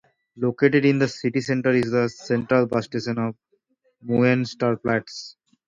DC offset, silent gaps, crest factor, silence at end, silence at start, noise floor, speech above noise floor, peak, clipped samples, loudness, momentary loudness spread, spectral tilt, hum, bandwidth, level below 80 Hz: under 0.1%; none; 18 dB; 0.35 s; 0.35 s; -67 dBFS; 45 dB; -4 dBFS; under 0.1%; -22 LUFS; 9 LU; -6.5 dB/octave; none; 7.8 kHz; -62 dBFS